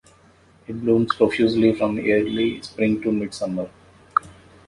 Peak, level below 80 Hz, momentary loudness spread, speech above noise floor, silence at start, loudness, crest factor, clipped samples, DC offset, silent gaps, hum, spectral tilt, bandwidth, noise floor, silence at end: -2 dBFS; -54 dBFS; 9 LU; 33 dB; 0.7 s; -21 LUFS; 20 dB; under 0.1%; under 0.1%; none; none; -6.5 dB/octave; 11.5 kHz; -54 dBFS; 0.35 s